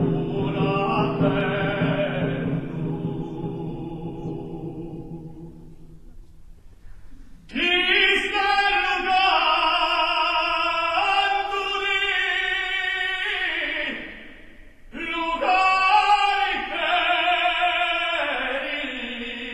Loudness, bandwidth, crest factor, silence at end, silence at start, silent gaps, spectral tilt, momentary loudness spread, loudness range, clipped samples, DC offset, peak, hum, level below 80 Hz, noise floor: -21 LUFS; 12 kHz; 18 dB; 0 s; 0 s; none; -5 dB/octave; 15 LU; 14 LU; under 0.1%; under 0.1%; -6 dBFS; none; -46 dBFS; -44 dBFS